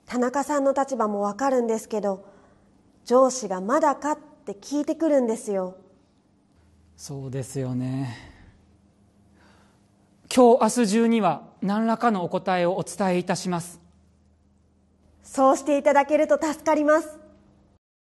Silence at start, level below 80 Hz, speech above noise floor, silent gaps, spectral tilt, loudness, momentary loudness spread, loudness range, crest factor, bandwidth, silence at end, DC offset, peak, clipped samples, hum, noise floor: 0.1 s; -64 dBFS; 39 dB; none; -5.5 dB/octave; -23 LUFS; 13 LU; 12 LU; 20 dB; 12.5 kHz; 0.85 s; under 0.1%; -6 dBFS; under 0.1%; none; -62 dBFS